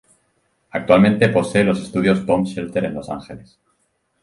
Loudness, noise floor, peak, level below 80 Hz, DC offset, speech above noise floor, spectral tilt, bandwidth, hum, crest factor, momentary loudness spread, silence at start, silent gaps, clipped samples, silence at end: -18 LUFS; -67 dBFS; 0 dBFS; -50 dBFS; under 0.1%; 50 dB; -7 dB/octave; 11.5 kHz; none; 20 dB; 16 LU; 0.75 s; none; under 0.1%; 0.85 s